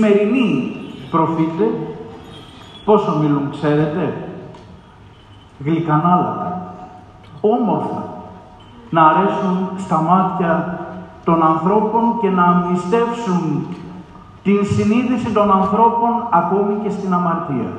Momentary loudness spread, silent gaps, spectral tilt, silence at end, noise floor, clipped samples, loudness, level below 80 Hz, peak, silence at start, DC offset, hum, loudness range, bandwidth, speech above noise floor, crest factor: 17 LU; none; -8 dB/octave; 0 s; -43 dBFS; under 0.1%; -17 LUFS; -52 dBFS; 0 dBFS; 0 s; under 0.1%; none; 4 LU; 9.2 kHz; 27 dB; 18 dB